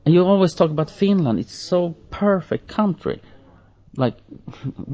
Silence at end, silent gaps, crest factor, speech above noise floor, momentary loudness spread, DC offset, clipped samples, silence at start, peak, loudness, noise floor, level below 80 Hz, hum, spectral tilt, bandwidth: 0 s; none; 16 dB; 30 dB; 16 LU; under 0.1%; under 0.1%; 0.05 s; -4 dBFS; -20 LUFS; -50 dBFS; -50 dBFS; none; -7.5 dB/octave; 8 kHz